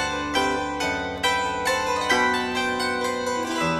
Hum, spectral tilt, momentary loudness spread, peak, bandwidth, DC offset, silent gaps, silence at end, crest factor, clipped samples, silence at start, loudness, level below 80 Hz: none; -3 dB/octave; 5 LU; -6 dBFS; 13.5 kHz; under 0.1%; none; 0 s; 18 dB; under 0.1%; 0 s; -23 LUFS; -48 dBFS